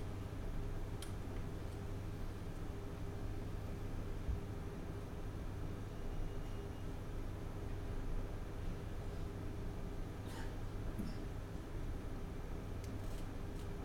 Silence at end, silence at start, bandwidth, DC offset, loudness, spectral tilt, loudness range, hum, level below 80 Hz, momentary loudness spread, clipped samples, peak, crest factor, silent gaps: 0 s; 0 s; 16.5 kHz; under 0.1%; -47 LUFS; -7 dB/octave; 1 LU; none; -46 dBFS; 2 LU; under 0.1%; -30 dBFS; 14 dB; none